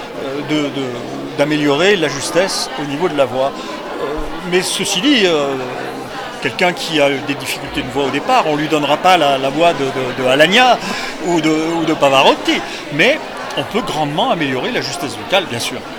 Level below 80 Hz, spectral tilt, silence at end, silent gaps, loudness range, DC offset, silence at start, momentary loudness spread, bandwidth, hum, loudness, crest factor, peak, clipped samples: -42 dBFS; -3.5 dB/octave; 0 s; none; 4 LU; under 0.1%; 0 s; 11 LU; 20 kHz; none; -15 LUFS; 16 dB; 0 dBFS; under 0.1%